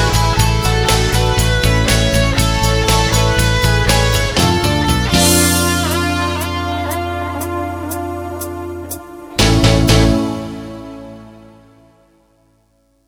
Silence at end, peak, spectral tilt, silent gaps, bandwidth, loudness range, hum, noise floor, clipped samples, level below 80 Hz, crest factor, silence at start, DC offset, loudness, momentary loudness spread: 1.7 s; 0 dBFS; -4 dB/octave; none; 19.5 kHz; 7 LU; none; -57 dBFS; under 0.1%; -22 dBFS; 14 dB; 0 s; under 0.1%; -14 LUFS; 14 LU